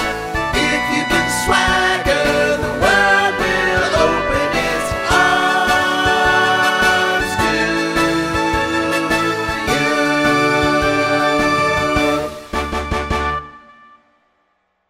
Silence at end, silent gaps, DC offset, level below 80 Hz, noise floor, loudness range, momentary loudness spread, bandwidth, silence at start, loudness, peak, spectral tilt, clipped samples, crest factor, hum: 1.3 s; none; 0.2%; -34 dBFS; -65 dBFS; 3 LU; 6 LU; 16 kHz; 0 s; -15 LUFS; 0 dBFS; -3.5 dB/octave; under 0.1%; 16 dB; none